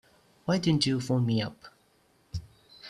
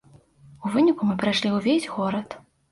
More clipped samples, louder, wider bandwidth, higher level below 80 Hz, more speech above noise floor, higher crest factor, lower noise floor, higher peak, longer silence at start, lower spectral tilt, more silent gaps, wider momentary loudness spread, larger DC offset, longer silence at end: neither; second, -28 LUFS vs -23 LUFS; first, 13 kHz vs 11.5 kHz; about the same, -56 dBFS vs -60 dBFS; first, 39 dB vs 30 dB; first, 20 dB vs 14 dB; first, -66 dBFS vs -53 dBFS; about the same, -10 dBFS vs -10 dBFS; about the same, 0.45 s vs 0.5 s; about the same, -6 dB/octave vs -5.5 dB/octave; neither; first, 16 LU vs 13 LU; neither; second, 0 s vs 0.35 s